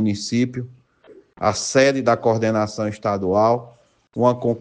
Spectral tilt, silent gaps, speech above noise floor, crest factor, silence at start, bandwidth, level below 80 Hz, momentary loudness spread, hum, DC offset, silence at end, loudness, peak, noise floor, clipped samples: -5.5 dB/octave; none; 30 dB; 16 dB; 0 s; 10 kHz; -58 dBFS; 8 LU; none; under 0.1%; 0 s; -20 LUFS; -4 dBFS; -49 dBFS; under 0.1%